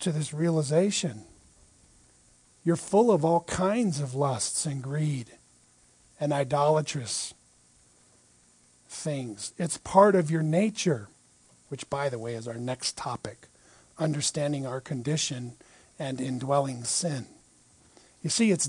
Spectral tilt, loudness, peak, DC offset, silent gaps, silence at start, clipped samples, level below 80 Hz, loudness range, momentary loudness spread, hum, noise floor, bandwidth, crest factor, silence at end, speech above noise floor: -5 dB/octave; -28 LUFS; -4 dBFS; under 0.1%; none; 0 s; under 0.1%; -64 dBFS; 5 LU; 14 LU; none; -61 dBFS; 10.5 kHz; 24 dB; 0 s; 34 dB